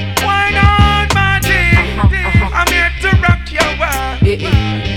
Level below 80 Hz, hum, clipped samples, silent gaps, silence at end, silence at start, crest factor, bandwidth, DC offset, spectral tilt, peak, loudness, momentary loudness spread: -18 dBFS; none; 0.1%; none; 0 s; 0 s; 12 dB; 18 kHz; under 0.1%; -5 dB/octave; 0 dBFS; -12 LUFS; 4 LU